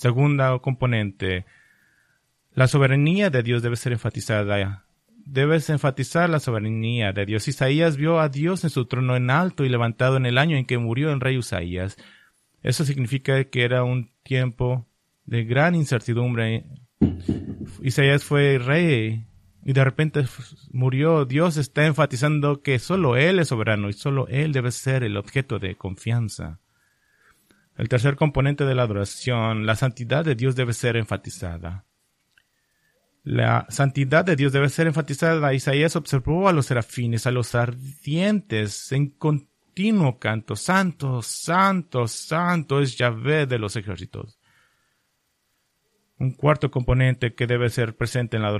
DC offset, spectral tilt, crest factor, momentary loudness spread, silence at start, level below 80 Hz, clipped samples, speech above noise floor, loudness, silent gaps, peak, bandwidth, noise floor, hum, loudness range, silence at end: under 0.1%; -6 dB/octave; 18 dB; 10 LU; 0 s; -48 dBFS; under 0.1%; 50 dB; -22 LUFS; none; -4 dBFS; 13 kHz; -71 dBFS; none; 5 LU; 0 s